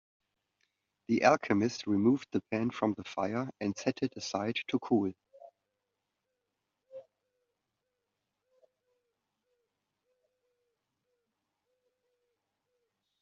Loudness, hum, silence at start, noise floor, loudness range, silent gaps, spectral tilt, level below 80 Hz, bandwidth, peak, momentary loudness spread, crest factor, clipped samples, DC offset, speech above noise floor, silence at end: -32 LUFS; none; 1.1 s; -86 dBFS; 7 LU; none; -5 dB/octave; -76 dBFS; 7.4 kHz; -10 dBFS; 9 LU; 26 dB; under 0.1%; under 0.1%; 55 dB; 6.2 s